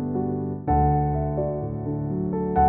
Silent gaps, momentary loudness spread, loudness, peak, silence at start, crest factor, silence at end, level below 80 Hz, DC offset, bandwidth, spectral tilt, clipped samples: none; 7 LU; -25 LUFS; -8 dBFS; 0 s; 14 dB; 0 s; -34 dBFS; under 0.1%; 2.8 kHz; -12 dB/octave; under 0.1%